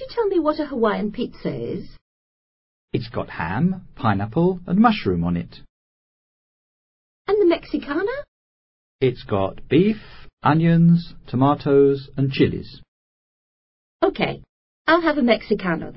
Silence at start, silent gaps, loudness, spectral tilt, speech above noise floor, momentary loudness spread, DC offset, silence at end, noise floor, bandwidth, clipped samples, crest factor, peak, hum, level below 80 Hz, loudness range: 0 s; 2.01-2.88 s, 5.69-7.25 s, 8.28-8.99 s, 10.33-10.37 s, 12.88-14.00 s, 14.49-14.85 s; -21 LUFS; -12 dB/octave; over 70 dB; 12 LU; under 0.1%; 0 s; under -90 dBFS; 5.8 kHz; under 0.1%; 20 dB; -2 dBFS; none; -46 dBFS; 7 LU